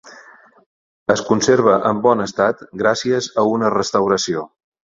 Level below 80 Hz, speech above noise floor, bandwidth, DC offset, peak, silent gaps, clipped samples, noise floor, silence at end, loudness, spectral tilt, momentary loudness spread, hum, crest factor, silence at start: -56 dBFS; 29 dB; 7.8 kHz; under 0.1%; 0 dBFS; 0.66-1.06 s; under 0.1%; -46 dBFS; 0.45 s; -17 LUFS; -4.5 dB/octave; 7 LU; none; 18 dB; 0.05 s